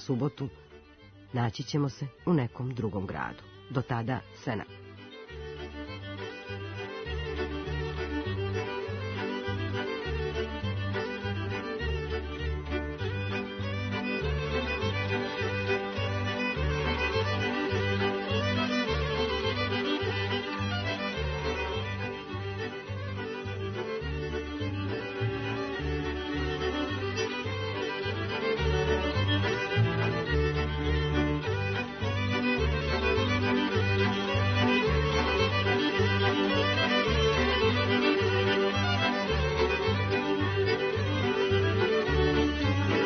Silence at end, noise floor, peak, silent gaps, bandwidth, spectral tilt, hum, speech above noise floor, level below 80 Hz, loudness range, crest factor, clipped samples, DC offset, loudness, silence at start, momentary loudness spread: 0 s; -53 dBFS; -14 dBFS; none; 6.6 kHz; -6 dB/octave; none; 21 dB; -42 dBFS; 9 LU; 16 dB; under 0.1%; under 0.1%; -30 LUFS; 0 s; 10 LU